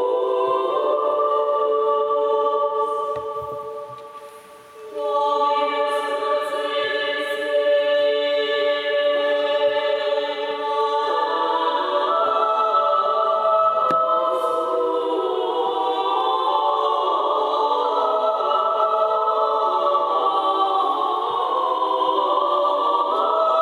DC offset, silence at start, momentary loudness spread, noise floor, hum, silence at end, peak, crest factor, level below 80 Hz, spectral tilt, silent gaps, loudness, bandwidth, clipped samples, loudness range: under 0.1%; 0 s; 5 LU; -43 dBFS; none; 0 s; -8 dBFS; 12 dB; -72 dBFS; -3.5 dB/octave; none; -20 LUFS; 13.5 kHz; under 0.1%; 4 LU